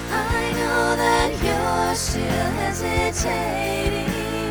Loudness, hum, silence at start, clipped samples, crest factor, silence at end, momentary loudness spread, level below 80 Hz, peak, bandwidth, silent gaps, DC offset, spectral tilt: -22 LUFS; none; 0 s; under 0.1%; 18 dB; 0 s; 4 LU; -32 dBFS; -4 dBFS; over 20 kHz; none; under 0.1%; -4 dB/octave